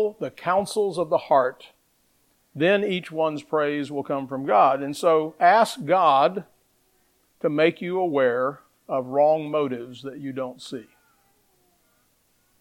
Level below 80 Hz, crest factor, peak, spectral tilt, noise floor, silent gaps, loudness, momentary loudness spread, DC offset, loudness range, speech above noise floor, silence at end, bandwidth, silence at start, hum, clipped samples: -72 dBFS; 20 dB; -4 dBFS; -5.5 dB/octave; -66 dBFS; none; -23 LUFS; 14 LU; under 0.1%; 6 LU; 43 dB; 1.8 s; 16 kHz; 0 s; none; under 0.1%